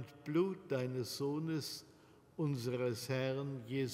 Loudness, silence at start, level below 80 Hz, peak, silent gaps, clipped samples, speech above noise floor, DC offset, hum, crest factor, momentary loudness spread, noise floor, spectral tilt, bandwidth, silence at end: -39 LUFS; 0 s; -78 dBFS; -24 dBFS; none; under 0.1%; 23 dB; under 0.1%; none; 16 dB; 5 LU; -62 dBFS; -6 dB/octave; 16 kHz; 0 s